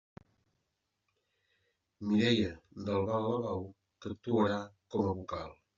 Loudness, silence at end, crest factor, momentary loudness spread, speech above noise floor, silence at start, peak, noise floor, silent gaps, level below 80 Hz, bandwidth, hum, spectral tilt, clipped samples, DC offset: -34 LUFS; 0.25 s; 20 dB; 13 LU; 51 dB; 2 s; -16 dBFS; -83 dBFS; none; -68 dBFS; 7.4 kHz; none; -5 dB/octave; under 0.1%; under 0.1%